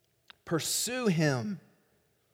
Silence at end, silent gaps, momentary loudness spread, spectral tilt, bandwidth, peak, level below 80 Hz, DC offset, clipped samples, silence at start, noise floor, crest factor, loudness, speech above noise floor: 0.75 s; none; 14 LU; -4 dB/octave; 17 kHz; -14 dBFS; -72 dBFS; under 0.1%; under 0.1%; 0.45 s; -71 dBFS; 18 dB; -30 LUFS; 41 dB